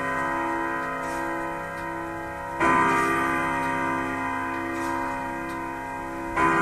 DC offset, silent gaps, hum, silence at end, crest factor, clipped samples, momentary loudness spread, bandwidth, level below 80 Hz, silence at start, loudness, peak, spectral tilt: under 0.1%; none; none; 0 s; 18 dB; under 0.1%; 11 LU; 15.5 kHz; -48 dBFS; 0 s; -26 LUFS; -8 dBFS; -5 dB/octave